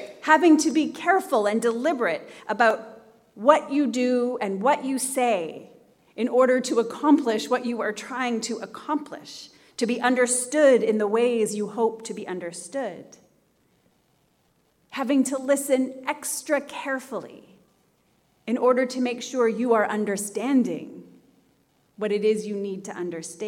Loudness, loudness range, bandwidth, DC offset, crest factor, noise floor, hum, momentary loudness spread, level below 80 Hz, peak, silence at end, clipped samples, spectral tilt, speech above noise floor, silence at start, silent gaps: -24 LUFS; 5 LU; 17 kHz; under 0.1%; 22 dB; -66 dBFS; none; 13 LU; -78 dBFS; -2 dBFS; 0 s; under 0.1%; -4 dB/octave; 43 dB; 0 s; none